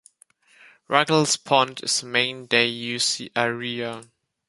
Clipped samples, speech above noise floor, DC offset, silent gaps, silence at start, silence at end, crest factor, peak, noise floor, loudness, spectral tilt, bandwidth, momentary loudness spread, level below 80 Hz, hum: under 0.1%; 35 dB; under 0.1%; none; 0.9 s; 0.45 s; 22 dB; -2 dBFS; -58 dBFS; -22 LUFS; -2.5 dB/octave; 11.5 kHz; 9 LU; -70 dBFS; none